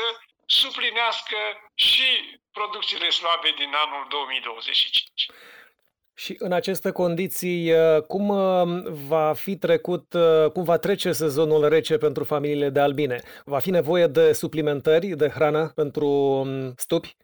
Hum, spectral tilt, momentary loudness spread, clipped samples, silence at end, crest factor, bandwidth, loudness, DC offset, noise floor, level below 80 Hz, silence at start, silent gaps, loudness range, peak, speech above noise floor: none; -4.5 dB/octave; 9 LU; under 0.1%; 0.1 s; 14 dB; over 20 kHz; -22 LUFS; under 0.1%; -66 dBFS; -64 dBFS; 0 s; none; 3 LU; -8 dBFS; 44 dB